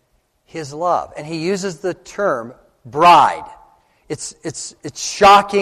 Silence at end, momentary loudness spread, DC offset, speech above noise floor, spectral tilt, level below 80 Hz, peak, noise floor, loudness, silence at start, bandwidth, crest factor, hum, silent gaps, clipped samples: 0 s; 20 LU; under 0.1%; 45 dB; -3.5 dB/octave; -50 dBFS; -2 dBFS; -61 dBFS; -15 LUFS; 0.55 s; 14 kHz; 16 dB; none; none; under 0.1%